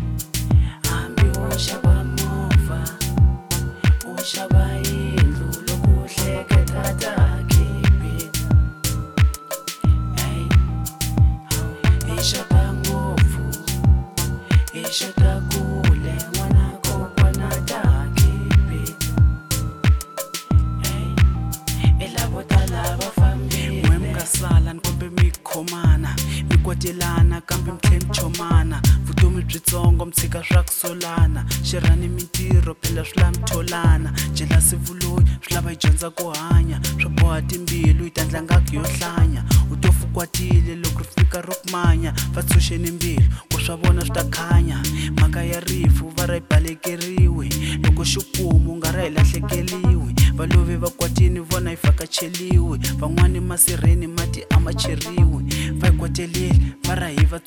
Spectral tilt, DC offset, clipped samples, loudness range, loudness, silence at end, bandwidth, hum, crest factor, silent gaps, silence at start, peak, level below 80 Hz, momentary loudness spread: -5 dB/octave; 0.2%; under 0.1%; 1 LU; -20 LUFS; 0.05 s; over 20 kHz; none; 16 dB; none; 0 s; -2 dBFS; -22 dBFS; 6 LU